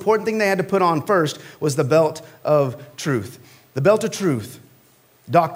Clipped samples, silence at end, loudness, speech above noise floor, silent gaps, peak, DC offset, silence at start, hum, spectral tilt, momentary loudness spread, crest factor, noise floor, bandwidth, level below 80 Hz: under 0.1%; 0 s; -20 LUFS; 35 dB; none; -2 dBFS; under 0.1%; 0 s; none; -6 dB/octave; 10 LU; 18 dB; -55 dBFS; 16 kHz; -64 dBFS